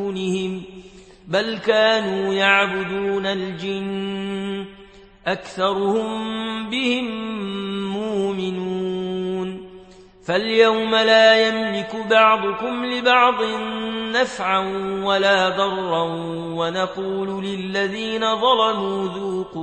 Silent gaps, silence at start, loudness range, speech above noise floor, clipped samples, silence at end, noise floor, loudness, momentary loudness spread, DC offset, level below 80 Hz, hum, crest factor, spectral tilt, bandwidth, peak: none; 0 s; 8 LU; 25 dB; under 0.1%; 0 s; -45 dBFS; -20 LUFS; 11 LU; under 0.1%; -56 dBFS; none; 20 dB; -4.5 dB/octave; 8.8 kHz; -2 dBFS